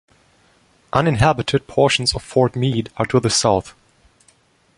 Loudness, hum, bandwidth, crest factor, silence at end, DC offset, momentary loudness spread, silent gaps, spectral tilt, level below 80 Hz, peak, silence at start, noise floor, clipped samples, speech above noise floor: -18 LUFS; none; 11.5 kHz; 18 dB; 1.05 s; under 0.1%; 6 LU; none; -4.5 dB/octave; -42 dBFS; -2 dBFS; 0.95 s; -57 dBFS; under 0.1%; 39 dB